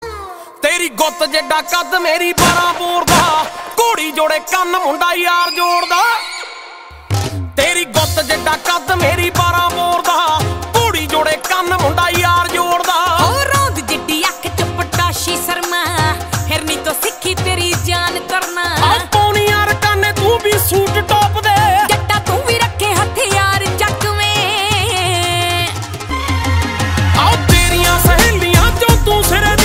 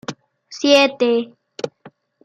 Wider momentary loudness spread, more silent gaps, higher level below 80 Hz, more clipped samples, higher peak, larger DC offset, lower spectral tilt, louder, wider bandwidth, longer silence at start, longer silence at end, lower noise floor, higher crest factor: second, 6 LU vs 20 LU; neither; first, -26 dBFS vs -72 dBFS; neither; about the same, 0 dBFS vs -2 dBFS; neither; about the same, -3.5 dB/octave vs -3 dB/octave; first, -13 LUFS vs -16 LUFS; first, 16.5 kHz vs 12.5 kHz; about the same, 0 s vs 0.1 s; second, 0 s vs 0.35 s; second, -34 dBFS vs -48 dBFS; about the same, 14 dB vs 18 dB